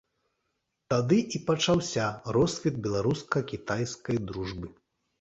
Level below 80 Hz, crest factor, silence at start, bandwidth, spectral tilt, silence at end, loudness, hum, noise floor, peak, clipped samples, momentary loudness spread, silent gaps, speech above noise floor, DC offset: -54 dBFS; 18 dB; 0.9 s; 8.2 kHz; -5.5 dB/octave; 0.5 s; -29 LUFS; none; -80 dBFS; -10 dBFS; under 0.1%; 10 LU; none; 52 dB; under 0.1%